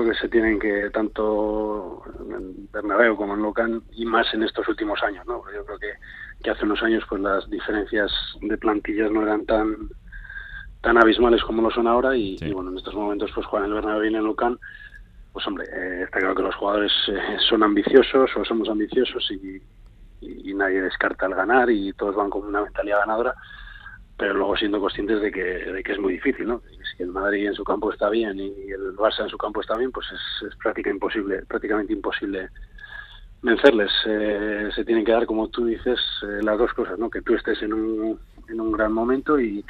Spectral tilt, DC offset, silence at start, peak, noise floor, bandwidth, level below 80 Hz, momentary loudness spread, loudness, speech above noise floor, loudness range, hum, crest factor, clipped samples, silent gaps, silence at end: -6.5 dB/octave; under 0.1%; 0 s; 0 dBFS; -44 dBFS; 5.6 kHz; -44 dBFS; 15 LU; -23 LUFS; 22 dB; 5 LU; none; 22 dB; under 0.1%; none; 0 s